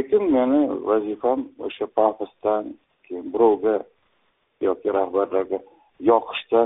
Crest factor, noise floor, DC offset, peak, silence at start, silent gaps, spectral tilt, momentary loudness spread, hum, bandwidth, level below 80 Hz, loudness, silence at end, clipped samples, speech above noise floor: 18 dB; -67 dBFS; under 0.1%; -4 dBFS; 0 s; none; -4 dB/octave; 11 LU; none; 4 kHz; -62 dBFS; -22 LUFS; 0 s; under 0.1%; 46 dB